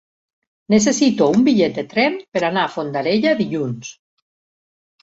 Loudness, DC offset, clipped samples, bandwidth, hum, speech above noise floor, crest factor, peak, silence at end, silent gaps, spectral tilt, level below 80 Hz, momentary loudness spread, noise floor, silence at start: -18 LUFS; under 0.1%; under 0.1%; 8 kHz; none; over 73 dB; 16 dB; -2 dBFS; 1.1 s; 2.28-2.32 s; -4.5 dB/octave; -58 dBFS; 9 LU; under -90 dBFS; 0.7 s